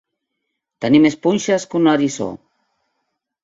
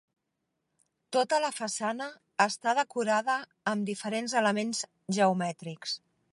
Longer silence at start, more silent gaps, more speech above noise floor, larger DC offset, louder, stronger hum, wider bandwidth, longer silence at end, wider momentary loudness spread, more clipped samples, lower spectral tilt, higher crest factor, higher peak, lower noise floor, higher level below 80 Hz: second, 0.8 s vs 1.1 s; neither; first, 61 dB vs 53 dB; neither; first, -17 LUFS vs -30 LUFS; neither; second, 8 kHz vs 11.5 kHz; first, 1.1 s vs 0.35 s; first, 12 LU vs 9 LU; neither; first, -5.5 dB/octave vs -3.5 dB/octave; about the same, 18 dB vs 22 dB; first, 0 dBFS vs -8 dBFS; second, -77 dBFS vs -82 dBFS; first, -58 dBFS vs -82 dBFS